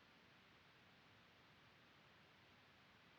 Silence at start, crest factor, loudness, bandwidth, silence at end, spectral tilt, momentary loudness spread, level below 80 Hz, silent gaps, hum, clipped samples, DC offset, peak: 0 s; 14 dB; -68 LUFS; 7.2 kHz; 0 s; -2 dB/octave; 0 LU; -90 dBFS; none; none; under 0.1%; under 0.1%; -56 dBFS